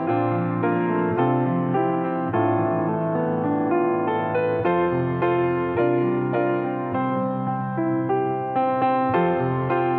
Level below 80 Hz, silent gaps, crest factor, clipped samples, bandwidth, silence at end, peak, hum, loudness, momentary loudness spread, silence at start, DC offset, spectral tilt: -60 dBFS; none; 12 dB; under 0.1%; 4.3 kHz; 0 s; -10 dBFS; none; -22 LUFS; 3 LU; 0 s; under 0.1%; -11.5 dB/octave